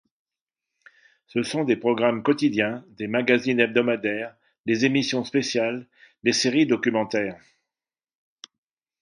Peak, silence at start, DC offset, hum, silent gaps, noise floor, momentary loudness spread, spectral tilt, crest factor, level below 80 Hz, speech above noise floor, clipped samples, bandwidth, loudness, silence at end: -4 dBFS; 1.35 s; under 0.1%; none; 4.60-4.64 s; under -90 dBFS; 10 LU; -4.5 dB/octave; 20 dB; -68 dBFS; over 67 dB; under 0.1%; 11.5 kHz; -23 LUFS; 1.65 s